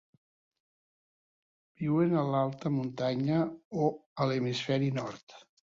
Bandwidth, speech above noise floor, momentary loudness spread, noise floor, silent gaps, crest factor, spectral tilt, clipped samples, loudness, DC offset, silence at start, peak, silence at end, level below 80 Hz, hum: 7.6 kHz; over 60 dB; 8 LU; under -90 dBFS; 3.65-3.71 s, 4.06-4.16 s, 5.23-5.27 s; 16 dB; -7.5 dB/octave; under 0.1%; -31 LUFS; under 0.1%; 1.8 s; -16 dBFS; 0.35 s; -70 dBFS; none